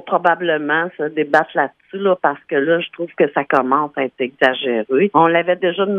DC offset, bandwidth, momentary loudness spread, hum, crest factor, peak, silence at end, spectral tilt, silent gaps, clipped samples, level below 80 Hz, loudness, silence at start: under 0.1%; 7.8 kHz; 7 LU; none; 16 dB; 0 dBFS; 0 s; -7 dB/octave; none; under 0.1%; -70 dBFS; -17 LUFS; 0.05 s